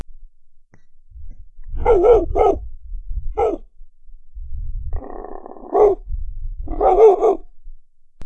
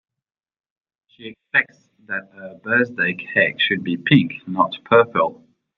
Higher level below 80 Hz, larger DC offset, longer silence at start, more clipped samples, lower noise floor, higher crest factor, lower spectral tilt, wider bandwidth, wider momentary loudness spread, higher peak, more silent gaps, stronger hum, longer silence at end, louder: first, -28 dBFS vs -64 dBFS; neither; second, 0.1 s vs 1.2 s; neither; second, -43 dBFS vs -87 dBFS; about the same, 18 dB vs 20 dB; about the same, -8.5 dB/octave vs -8 dB/octave; first, 6.8 kHz vs 6 kHz; first, 23 LU vs 19 LU; about the same, -2 dBFS vs -2 dBFS; neither; neither; second, 0 s vs 0.45 s; first, -16 LUFS vs -19 LUFS